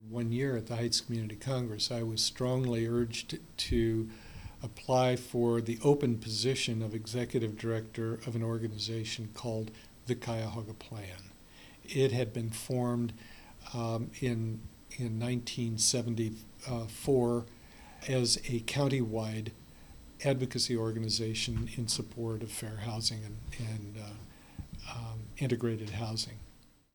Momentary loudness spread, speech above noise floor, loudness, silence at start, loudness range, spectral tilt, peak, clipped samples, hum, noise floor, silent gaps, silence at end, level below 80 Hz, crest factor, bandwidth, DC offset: 16 LU; 25 dB; -33 LUFS; 0 s; 6 LU; -5 dB/octave; -14 dBFS; under 0.1%; none; -59 dBFS; none; 0.35 s; -54 dBFS; 20 dB; over 20 kHz; under 0.1%